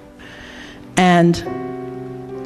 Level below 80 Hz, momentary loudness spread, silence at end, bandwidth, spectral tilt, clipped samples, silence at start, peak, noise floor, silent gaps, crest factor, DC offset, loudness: -46 dBFS; 23 LU; 0 s; 12 kHz; -6 dB/octave; under 0.1%; 0 s; 0 dBFS; -38 dBFS; none; 20 dB; under 0.1%; -17 LUFS